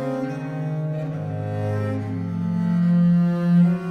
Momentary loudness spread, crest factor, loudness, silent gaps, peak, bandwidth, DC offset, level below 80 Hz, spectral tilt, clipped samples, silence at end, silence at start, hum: 10 LU; 12 dB; -22 LUFS; none; -10 dBFS; 4.8 kHz; under 0.1%; -58 dBFS; -10 dB/octave; under 0.1%; 0 s; 0 s; none